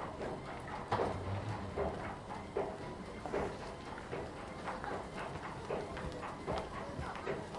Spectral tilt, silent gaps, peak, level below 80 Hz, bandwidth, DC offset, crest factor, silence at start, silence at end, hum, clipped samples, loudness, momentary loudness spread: -6 dB/octave; none; -22 dBFS; -56 dBFS; 11.5 kHz; under 0.1%; 20 dB; 0 s; 0 s; none; under 0.1%; -42 LUFS; 7 LU